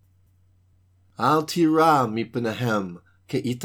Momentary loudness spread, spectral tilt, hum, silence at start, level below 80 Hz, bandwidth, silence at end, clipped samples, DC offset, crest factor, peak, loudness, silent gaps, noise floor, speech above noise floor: 10 LU; -6 dB/octave; none; 1.2 s; -68 dBFS; 18 kHz; 0 s; under 0.1%; under 0.1%; 18 dB; -6 dBFS; -22 LUFS; none; -60 dBFS; 38 dB